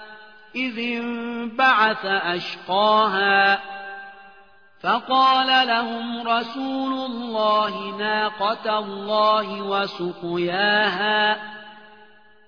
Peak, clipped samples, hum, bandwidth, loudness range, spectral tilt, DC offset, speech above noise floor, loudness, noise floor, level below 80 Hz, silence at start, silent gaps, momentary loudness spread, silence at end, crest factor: -4 dBFS; under 0.1%; none; 5.4 kHz; 3 LU; -5 dB/octave; 0.2%; 31 dB; -21 LUFS; -53 dBFS; -70 dBFS; 0 s; none; 11 LU; 0.7 s; 18 dB